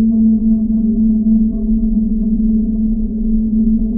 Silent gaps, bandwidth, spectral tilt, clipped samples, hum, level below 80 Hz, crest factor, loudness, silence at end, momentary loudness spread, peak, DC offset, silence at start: none; 0.9 kHz; -18 dB/octave; under 0.1%; none; -22 dBFS; 10 dB; -15 LUFS; 0 s; 5 LU; -4 dBFS; under 0.1%; 0 s